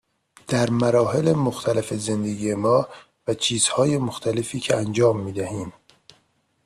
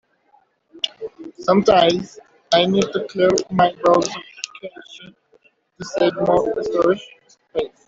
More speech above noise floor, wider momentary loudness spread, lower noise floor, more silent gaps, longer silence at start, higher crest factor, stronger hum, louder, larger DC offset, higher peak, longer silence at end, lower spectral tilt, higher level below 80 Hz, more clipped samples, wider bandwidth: about the same, 44 dB vs 41 dB; second, 10 LU vs 19 LU; first, -65 dBFS vs -59 dBFS; neither; second, 0.5 s vs 0.75 s; about the same, 16 dB vs 18 dB; neither; second, -22 LUFS vs -19 LUFS; neither; second, -6 dBFS vs -2 dBFS; first, 0.95 s vs 0.2 s; about the same, -5 dB/octave vs -5 dB/octave; about the same, -58 dBFS vs -54 dBFS; neither; first, 14 kHz vs 7.8 kHz